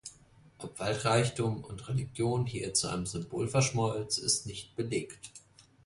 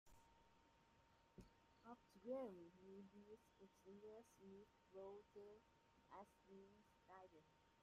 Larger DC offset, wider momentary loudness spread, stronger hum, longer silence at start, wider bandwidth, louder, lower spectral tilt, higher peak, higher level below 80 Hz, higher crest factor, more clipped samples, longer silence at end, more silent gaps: neither; about the same, 16 LU vs 14 LU; neither; about the same, 0.05 s vs 0.05 s; about the same, 11.5 kHz vs 12.5 kHz; first, -32 LUFS vs -62 LUFS; second, -4 dB/octave vs -6.5 dB/octave; first, -14 dBFS vs -42 dBFS; first, -58 dBFS vs -84 dBFS; about the same, 18 dB vs 22 dB; neither; first, 0.25 s vs 0 s; neither